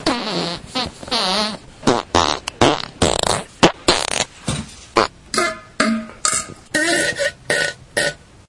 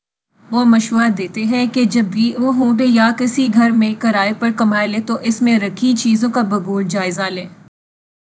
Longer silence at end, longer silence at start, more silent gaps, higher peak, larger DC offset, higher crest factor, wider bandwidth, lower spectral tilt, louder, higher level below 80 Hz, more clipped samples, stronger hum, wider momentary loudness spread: second, 0.35 s vs 0.75 s; second, 0 s vs 0.5 s; neither; about the same, 0 dBFS vs 0 dBFS; neither; about the same, 20 dB vs 16 dB; first, 11.5 kHz vs 8 kHz; second, -2.5 dB/octave vs -5 dB/octave; second, -19 LUFS vs -15 LUFS; first, -42 dBFS vs -64 dBFS; neither; neither; about the same, 7 LU vs 6 LU